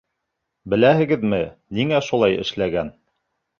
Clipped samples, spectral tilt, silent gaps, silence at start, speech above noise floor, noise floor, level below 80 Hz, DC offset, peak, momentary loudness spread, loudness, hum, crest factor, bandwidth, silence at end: under 0.1%; -6.5 dB/octave; none; 0.65 s; 59 dB; -78 dBFS; -50 dBFS; under 0.1%; -2 dBFS; 10 LU; -20 LUFS; none; 18 dB; 7.2 kHz; 0.7 s